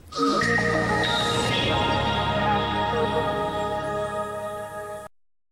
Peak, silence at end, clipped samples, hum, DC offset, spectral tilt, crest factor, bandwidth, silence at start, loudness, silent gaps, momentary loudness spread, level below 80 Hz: -10 dBFS; 0.45 s; under 0.1%; none; under 0.1%; -4.5 dB/octave; 14 dB; 17.5 kHz; 0.05 s; -24 LUFS; none; 11 LU; -42 dBFS